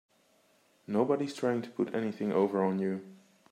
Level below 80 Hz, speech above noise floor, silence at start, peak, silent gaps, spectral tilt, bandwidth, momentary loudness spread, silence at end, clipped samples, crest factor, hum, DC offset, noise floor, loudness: -80 dBFS; 37 dB; 0.9 s; -14 dBFS; none; -7.5 dB/octave; 13 kHz; 6 LU; 0.35 s; under 0.1%; 18 dB; none; under 0.1%; -68 dBFS; -32 LUFS